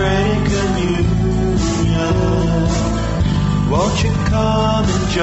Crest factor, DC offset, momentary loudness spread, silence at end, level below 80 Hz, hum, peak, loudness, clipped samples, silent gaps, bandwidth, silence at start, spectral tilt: 12 dB; under 0.1%; 2 LU; 0 s; -24 dBFS; none; -4 dBFS; -16 LUFS; under 0.1%; none; 8.2 kHz; 0 s; -6 dB/octave